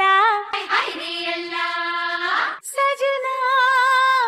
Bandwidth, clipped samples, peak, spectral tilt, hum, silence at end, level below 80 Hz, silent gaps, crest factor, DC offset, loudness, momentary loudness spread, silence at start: 15.5 kHz; under 0.1%; -6 dBFS; 0.5 dB/octave; none; 0 s; -74 dBFS; none; 14 dB; under 0.1%; -20 LUFS; 9 LU; 0 s